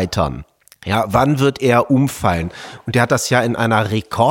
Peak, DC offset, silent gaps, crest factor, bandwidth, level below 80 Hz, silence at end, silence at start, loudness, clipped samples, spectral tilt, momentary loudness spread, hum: -2 dBFS; under 0.1%; none; 16 dB; 17 kHz; -40 dBFS; 0 s; 0 s; -16 LUFS; under 0.1%; -5.5 dB/octave; 10 LU; none